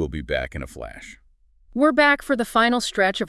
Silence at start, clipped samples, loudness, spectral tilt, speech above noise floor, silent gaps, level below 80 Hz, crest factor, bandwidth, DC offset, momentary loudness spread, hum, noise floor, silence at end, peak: 0 s; under 0.1%; -20 LUFS; -4 dB/octave; 34 dB; none; -42 dBFS; 16 dB; 12 kHz; under 0.1%; 19 LU; none; -55 dBFS; 0 s; -6 dBFS